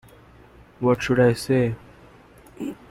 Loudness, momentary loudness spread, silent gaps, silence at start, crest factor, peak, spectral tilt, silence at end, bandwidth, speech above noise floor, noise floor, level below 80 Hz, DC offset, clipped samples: -21 LUFS; 16 LU; none; 0.8 s; 18 dB; -6 dBFS; -6.5 dB/octave; 0.15 s; 15 kHz; 30 dB; -50 dBFS; -50 dBFS; under 0.1%; under 0.1%